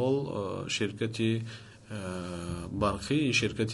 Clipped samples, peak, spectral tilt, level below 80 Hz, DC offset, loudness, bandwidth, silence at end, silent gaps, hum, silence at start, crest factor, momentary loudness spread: under 0.1%; -12 dBFS; -5 dB/octave; -52 dBFS; under 0.1%; -31 LUFS; 11.5 kHz; 0 s; none; none; 0 s; 18 dB; 12 LU